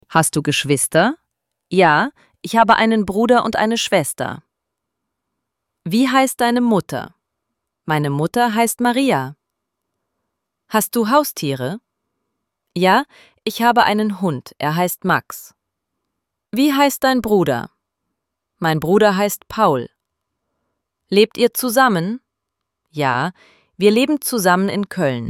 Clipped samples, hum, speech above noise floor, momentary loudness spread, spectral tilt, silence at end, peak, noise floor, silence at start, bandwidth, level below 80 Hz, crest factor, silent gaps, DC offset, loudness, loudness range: under 0.1%; none; 63 dB; 13 LU; -4.5 dB/octave; 0 s; 0 dBFS; -79 dBFS; 0.1 s; 17 kHz; -56 dBFS; 18 dB; none; under 0.1%; -17 LUFS; 4 LU